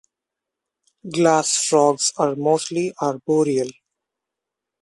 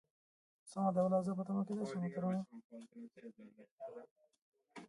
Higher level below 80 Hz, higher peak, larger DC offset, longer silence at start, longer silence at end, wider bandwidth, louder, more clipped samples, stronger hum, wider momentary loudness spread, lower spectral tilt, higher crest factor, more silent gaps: first, -68 dBFS vs -84 dBFS; first, -2 dBFS vs -24 dBFS; neither; first, 1.05 s vs 0.65 s; first, 1.1 s vs 0 s; about the same, 11.5 kHz vs 11 kHz; first, -19 LUFS vs -38 LUFS; neither; neither; second, 8 LU vs 22 LU; second, -4 dB/octave vs -8.5 dB/octave; about the same, 20 dB vs 18 dB; second, none vs 2.64-2.70 s, 3.71-3.78 s, 4.11-4.16 s, 4.38-4.52 s